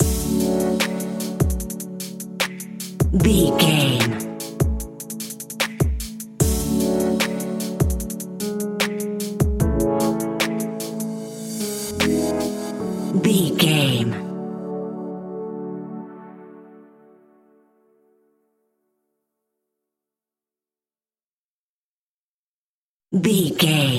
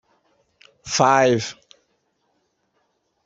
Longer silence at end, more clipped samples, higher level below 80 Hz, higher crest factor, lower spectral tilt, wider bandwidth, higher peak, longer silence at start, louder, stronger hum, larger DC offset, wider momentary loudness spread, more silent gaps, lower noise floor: second, 0 s vs 1.75 s; neither; first, -34 dBFS vs -64 dBFS; about the same, 20 dB vs 22 dB; about the same, -5 dB/octave vs -4 dB/octave; first, 16.5 kHz vs 8 kHz; about the same, -2 dBFS vs -2 dBFS; second, 0 s vs 0.85 s; second, -22 LUFS vs -19 LUFS; neither; neither; second, 14 LU vs 18 LU; first, 21.26-23.00 s vs none; first, under -90 dBFS vs -70 dBFS